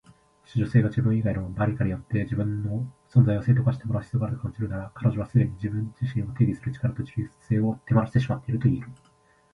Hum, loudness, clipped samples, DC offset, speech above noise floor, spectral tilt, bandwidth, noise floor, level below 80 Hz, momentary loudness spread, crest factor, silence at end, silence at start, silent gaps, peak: none; -26 LUFS; under 0.1%; under 0.1%; 31 dB; -10 dB/octave; 5.2 kHz; -56 dBFS; -48 dBFS; 9 LU; 18 dB; 0.6 s; 0.55 s; none; -6 dBFS